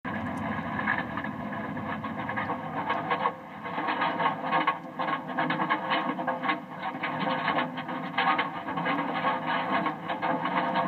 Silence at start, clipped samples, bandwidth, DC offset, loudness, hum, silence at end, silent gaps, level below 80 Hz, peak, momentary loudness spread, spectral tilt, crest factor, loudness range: 0.05 s; under 0.1%; 15.5 kHz; under 0.1%; -30 LUFS; none; 0 s; none; -68 dBFS; -12 dBFS; 7 LU; -7 dB/octave; 18 dB; 3 LU